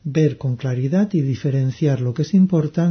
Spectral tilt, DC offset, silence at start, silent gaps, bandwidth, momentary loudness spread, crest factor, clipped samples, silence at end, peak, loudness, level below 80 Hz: -8.5 dB/octave; under 0.1%; 0.05 s; none; 6.6 kHz; 6 LU; 12 dB; under 0.1%; 0 s; -6 dBFS; -19 LUFS; -56 dBFS